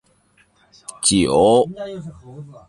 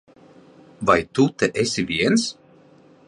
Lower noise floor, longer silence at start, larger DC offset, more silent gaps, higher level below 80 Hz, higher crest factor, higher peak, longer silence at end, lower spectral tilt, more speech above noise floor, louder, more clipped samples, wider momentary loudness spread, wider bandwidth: first, -58 dBFS vs -51 dBFS; about the same, 0.9 s vs 0.8 s; neither; neither; first, -46 dBFS vs -52 dBFS; about the same, 18 dB vs 20 dB; about the same, -2 dBFS vs -2 dBFS; second, 0.1 s vs 0.75 s; about the same, -4 dB/octave vs -4.5 dB/octave; first, 40 dB vs 31 dB; first, -16 LUFS vs -21 LUFS; neither; first, 24 LU vs 5 LU; about the same, 11.5 kHz vs 11 kHz